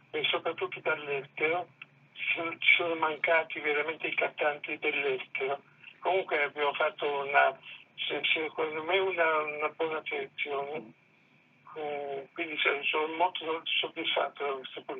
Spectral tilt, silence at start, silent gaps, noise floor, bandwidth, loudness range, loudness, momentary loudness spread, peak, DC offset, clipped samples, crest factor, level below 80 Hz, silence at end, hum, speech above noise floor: -6 dB/octave; 0.15 s; none; -64 dBFS; 4.7 kHz; 5 LU; -30 LUFS; 10 LU; -10 dBFS; under 0.1%; under 0.1%; 22 dB; under -90 dBFS; 0 s; none; 33 dB